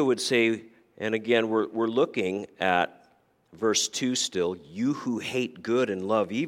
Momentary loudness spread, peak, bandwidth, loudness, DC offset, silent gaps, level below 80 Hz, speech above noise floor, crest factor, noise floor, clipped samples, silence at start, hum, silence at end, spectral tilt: 7 LU; -8 dBFS; 16 kHz; -27 LUFS; under 0.1%; none; -72 dBFS; 37 dB; 20 dB; -64 dBFS; under 0.1%; 0 s; none; 0 s; -3.5 dB/octave